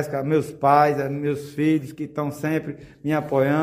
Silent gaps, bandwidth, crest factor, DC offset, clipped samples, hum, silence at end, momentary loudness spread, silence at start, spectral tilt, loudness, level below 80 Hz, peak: none; 16 kHz; 18 dB; under 0.1%; under 0.1%; none; 0 s; 11 LU; 0 s; -7.5 dB/octave; -23 LUFS; -60 dBFS; -4 dBFS